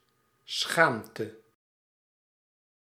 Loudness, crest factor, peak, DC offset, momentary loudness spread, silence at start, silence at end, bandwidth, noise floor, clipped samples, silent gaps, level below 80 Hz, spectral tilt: -27 LUFS; 28 dB; -6 dBFS; under 0.1%; 15 LU; 0.5 s; 1.45 s; 16 kHz; -59 dBFS; under 0.1%; none; -80 dBFS; -3 dB/octave